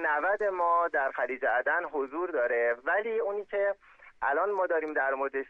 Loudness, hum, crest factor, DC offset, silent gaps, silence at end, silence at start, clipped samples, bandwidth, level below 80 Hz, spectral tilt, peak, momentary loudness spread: -29 LUFS; none; 14 dB; under 0.1%; none; 0.05 s; 0 s; under 0.1%; 5 kHz; -70 dBFS; -5.5 dB/octave; -16 dBFS; 6 LU